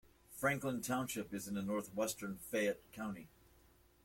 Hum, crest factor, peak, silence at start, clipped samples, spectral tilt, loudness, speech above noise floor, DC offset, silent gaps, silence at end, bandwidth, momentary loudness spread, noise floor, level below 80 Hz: none; 22 dB; -20 dBFS; 0.3 s; under 0.1%; -4.5 dB/octave; -40 LUFS; 28 dB; under 0.1%; none; 0.75 s; 16.5 kHz; 9 LU; -68 dBFS; -70 dBFS